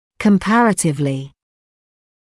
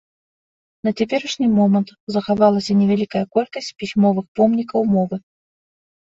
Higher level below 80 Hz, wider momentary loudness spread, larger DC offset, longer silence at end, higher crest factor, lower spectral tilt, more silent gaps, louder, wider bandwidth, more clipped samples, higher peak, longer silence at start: first, -50 dBFS vs -58 dBFS; about the same, 9 LU vs 9 LU; neither; about the same, 0.95 s vs 0.9 s; about the same, 14 dB vs 18 dB; second, -5.5 dB/octave vs -7 dB/octave; second, none vs 2.00-2.07 s, 4.28-4.35 s; first, -16 LUFS vs -19 LUFS; first, 12 kHz vs 7.8 kHz; neither; about the same, -4 dBFS vs -2 dBFS; second, 0.2 s vs 0.85 s